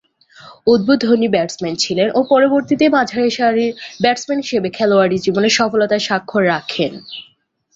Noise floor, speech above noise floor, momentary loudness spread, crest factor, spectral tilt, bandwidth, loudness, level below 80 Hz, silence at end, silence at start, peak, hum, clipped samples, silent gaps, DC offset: -43 dBFS; 28 dB; 8 LU; 14 dB; -4.5 dB/octave; 8 kHz; -15 LUFS; -56 dBFS; 0.55 s; 0.45 s; -2 dBFS; none; under 0.1%; none; under 0.1%